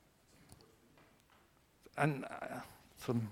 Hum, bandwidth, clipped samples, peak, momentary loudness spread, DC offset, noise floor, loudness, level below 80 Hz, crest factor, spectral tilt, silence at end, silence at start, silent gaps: none; 16.5 kHz; under 0.1%; -16 dBFS; 26 LU; under 0.1%; -69 dBFS; -40 LUFS; -72 dBFS; 28 dB; -6.5 dB/octave; 0 s; 0.5 s; none